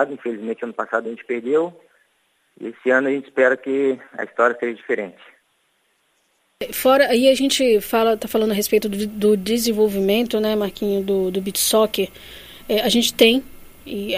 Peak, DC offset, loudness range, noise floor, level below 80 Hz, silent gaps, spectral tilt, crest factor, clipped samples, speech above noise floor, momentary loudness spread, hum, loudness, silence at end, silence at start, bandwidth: -2 dBFS; under 0.1%; 5 LU; -65 dBFS; -52 dBFS; none; -3.5 dB/octave; 18 dB; under 0.1%; 46 dB; 13 LU; none; -19 LUFS; 0 s; 0 s; 15.5 kHz